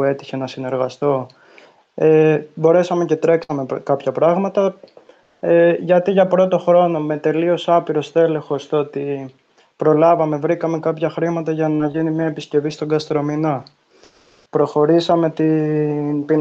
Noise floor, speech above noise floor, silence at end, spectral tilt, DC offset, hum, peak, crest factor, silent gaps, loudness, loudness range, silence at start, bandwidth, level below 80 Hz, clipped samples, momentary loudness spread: -51 dBFS; 35 dB; 0 s; -7.5 dB/octave; under 0.1%; none; -2 dBFS; 14 dB; none; -17 LUFS; 4 LU; 0 s; 7.8 kHz; -64 dBFS; under 0.1%; 9 LU